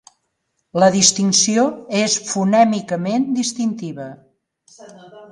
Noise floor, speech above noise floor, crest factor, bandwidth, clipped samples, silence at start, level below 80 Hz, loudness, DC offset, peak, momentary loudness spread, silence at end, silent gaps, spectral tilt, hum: -71 dBFS; 54 dB; 18 dB; 11.5 kHz; under 0.1%; 0.75 s; -64 dBFS; -16 LUFS; under 0.1%; 0 dBFS; 15 LU; 0.05 s; none; -3.5 dB/octave; none